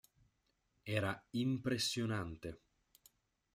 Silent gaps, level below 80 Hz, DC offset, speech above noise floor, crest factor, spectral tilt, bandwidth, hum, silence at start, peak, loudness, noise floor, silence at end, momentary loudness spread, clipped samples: none; -68 dBFS; under 0.1%; 42 dB; 22 dB; -4.5 dB/octave; 16 kHz; none; 0.85 s; -20 dBFS; -39 LUFS; -81 dBFS; 1 s; 15 LU; under 0.1%